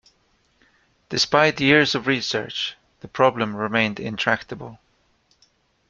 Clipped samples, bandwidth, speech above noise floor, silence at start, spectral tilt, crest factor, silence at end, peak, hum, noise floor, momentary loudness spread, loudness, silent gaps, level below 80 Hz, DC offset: under 0.1%; 8.6 kHz; 43 dB; 1.1 s; -4 dB/octave; 22 dB; 1.15 s; -2 dBFS; none; -64 dBFS; 15 LU; -21 LUFS; none; -60 dBFS; under 0.1%